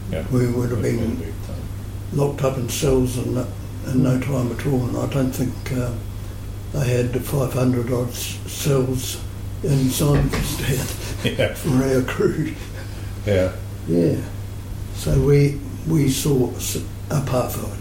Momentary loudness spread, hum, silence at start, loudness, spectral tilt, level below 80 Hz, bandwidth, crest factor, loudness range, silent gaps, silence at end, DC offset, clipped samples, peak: 12 LU; none; 0 s; -22 LUFS; -6 dB/octave; -34 dBFS; 17 kHz; 16 dB; 2 LU; none; 0 s; under 0.1%; under 0.1%; -6 dBFS